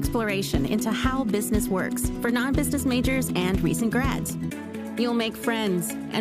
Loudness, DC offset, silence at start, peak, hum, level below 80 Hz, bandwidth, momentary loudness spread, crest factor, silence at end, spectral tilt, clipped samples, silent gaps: -25 LUFS; under 0.1%; 0 s; -10 dBFS; none; -36 dBFS; 15.5 kHz; 5 LU; 16 dB; 0 s; -5 dB/octave; under 0.1%; none